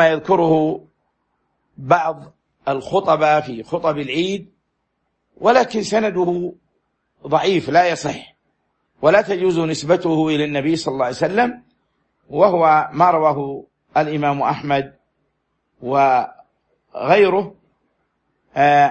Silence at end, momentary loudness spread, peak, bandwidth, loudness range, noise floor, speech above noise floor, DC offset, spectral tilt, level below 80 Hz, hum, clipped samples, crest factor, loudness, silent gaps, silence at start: 0 s; 14 LU; -2 dBFS; 8.8 kHz; 3 LU; -71 dBFS; 55 dB; under 0.1%; -5.5 dB/octave; -58 dBFS; none; under 0.1%; 18 dB; -18 LUFS; none; 0 s